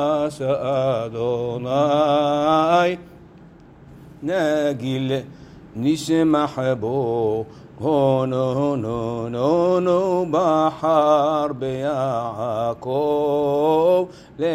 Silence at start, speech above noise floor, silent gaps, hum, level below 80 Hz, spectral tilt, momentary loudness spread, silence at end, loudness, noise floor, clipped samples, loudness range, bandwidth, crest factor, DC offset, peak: 0 s; 26 dB; none; none; -54 dBFS; -7 dB/octave; 8 LU; 0 s; -20 LUFS; -45 dBFS; under 0.1%; 3 LU; 14.5 kHz; 16 dB; under 0.1%; -4 dBFS